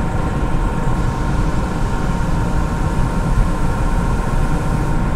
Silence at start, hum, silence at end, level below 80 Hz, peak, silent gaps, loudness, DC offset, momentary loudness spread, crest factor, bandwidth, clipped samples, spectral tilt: 0 s; none; 0 s; -18 dBFS; -2 dBFS; none; -20 LUFS; under 0.1%; 1 LU; 14 dB; 12.5 kHz; under 0.1%; -7 dB/octave